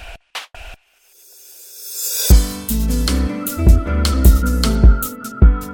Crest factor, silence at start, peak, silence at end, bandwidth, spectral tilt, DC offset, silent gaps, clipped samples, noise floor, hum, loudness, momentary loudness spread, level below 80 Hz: 14 dB; 0 s; 0 dBFS; 0 s; 17.5 kHz; -5 dB/octave; under 0.1%; none; under 0.1%; -52 dBFS; none; -16 LUFS; 17 LU; -16 dBFS